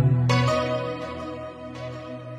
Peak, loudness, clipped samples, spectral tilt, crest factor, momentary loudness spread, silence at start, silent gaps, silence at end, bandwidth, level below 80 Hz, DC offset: -6 dBFS; -26 LUFS; under 0.1%; -6.5 dB/octave; 20 dB; 16 LU; 0 s; none; 0 s; 9.4 kHz; -50 dBFS; under 0.1%